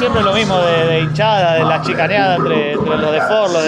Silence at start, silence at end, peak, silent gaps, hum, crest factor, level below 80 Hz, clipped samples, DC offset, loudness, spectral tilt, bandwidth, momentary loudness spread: 0 s; 0 s; -2 dBFS; none; none; 12 dB; -44 dBFS; under 0.1%; under 0.1%; -14 LUFS; -5.5 dB/octave; 10.5 kHz; 2 LU